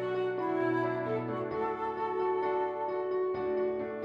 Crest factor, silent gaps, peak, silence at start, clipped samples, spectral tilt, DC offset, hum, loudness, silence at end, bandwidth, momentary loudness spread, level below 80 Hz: 12 dB; none; -20 dBFS; 0 s; under 0.1%; -8.5 dB/octave; under 0.1%; none; -32 LUFS; 0 s; 5.2 kHz; 3 LU; -68 dBFS